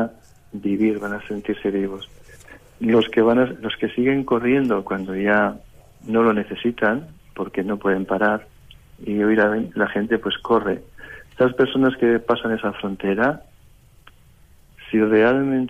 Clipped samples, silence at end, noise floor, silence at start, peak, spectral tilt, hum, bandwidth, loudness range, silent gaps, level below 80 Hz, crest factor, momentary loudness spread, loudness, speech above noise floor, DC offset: under 0.1%; 0 s; -50 dBFS; 0 s; -6 dBFS; -7.5 dB/octave; none; 13.5 kHz; 2 LU; none; -52 dBFS; 16 dB; 12 LU; -21 LUFS; 30 dB; under 0.1%